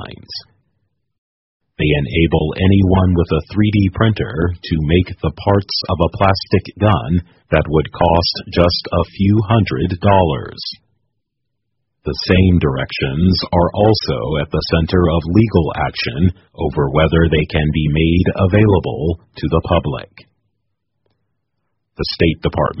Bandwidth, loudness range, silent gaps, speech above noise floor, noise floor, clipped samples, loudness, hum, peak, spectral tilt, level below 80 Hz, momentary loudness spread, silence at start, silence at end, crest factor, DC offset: 6 kHz; 3 LU; 1.18-1.60 s; 60 dB; -74 dBFS; under 0.1%; -16 LUFS; none; 0 dBFS; -5.5 dB/octave; -30 dBFS; 9 LU; 0 s; 0 s; 16 dB; under 0.1%